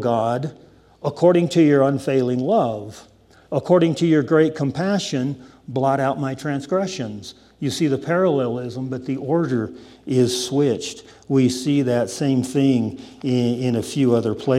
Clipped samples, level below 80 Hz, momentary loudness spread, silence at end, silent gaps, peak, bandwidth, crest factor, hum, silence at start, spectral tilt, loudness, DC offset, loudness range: under 0.1%; -60 dBFS; 13 LU; 0 s; none; -4 dBFS; 14.5 kHz; 16 dB; none; 0 s; -6.5 dB/octave; -20 LUFS; under 0.1%; 4 LU